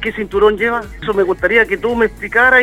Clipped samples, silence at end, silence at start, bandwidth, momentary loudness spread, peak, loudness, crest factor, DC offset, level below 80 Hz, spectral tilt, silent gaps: under 0.1%; 0 s; 0 s; 15 kHz; 6 LU; 0 dBFS; -14 LUFS; 14 dB; under 0.1%; -36 dBFS; -5.5 dB/octave; none